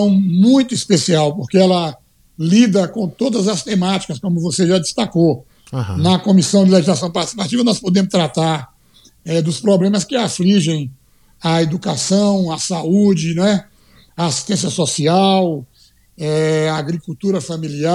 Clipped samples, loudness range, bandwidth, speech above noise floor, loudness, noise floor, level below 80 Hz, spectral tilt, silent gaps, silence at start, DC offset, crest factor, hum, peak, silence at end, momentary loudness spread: under 0.1%; 3 LU; 12 kHz; 36 dB; -16 LUFS; -51 dBFS; -54 dBFS; -5.5 dB/octave; none; 0 s; under 0.1%; 16 dB; none; 0 dBFS; 0 s; 10 LU